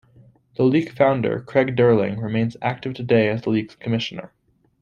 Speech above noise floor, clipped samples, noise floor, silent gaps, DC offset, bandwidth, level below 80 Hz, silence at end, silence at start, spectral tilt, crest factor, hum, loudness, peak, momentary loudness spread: 32 dB; under 0.1%; -52 dBFS; none; under 0.1%; 7.2 kHz; -58 dBFS; 0.55 s; 0.6 s; -8 dB/octave; 18 dB; none; -21 LUFS; -2 dBFS; 9 LU